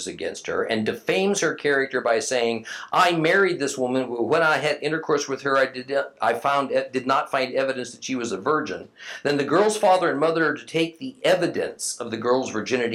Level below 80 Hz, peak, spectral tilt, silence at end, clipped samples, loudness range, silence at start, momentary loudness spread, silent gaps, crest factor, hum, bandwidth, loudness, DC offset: -72 dBFS; -6 dBFS; -3.5 dB/octave; 0 s; under 0.1%; 3 LU; 0 s; 8 LU; none; 16 dB; none; 15.5 kHz; -23 LUFS; under 0.1%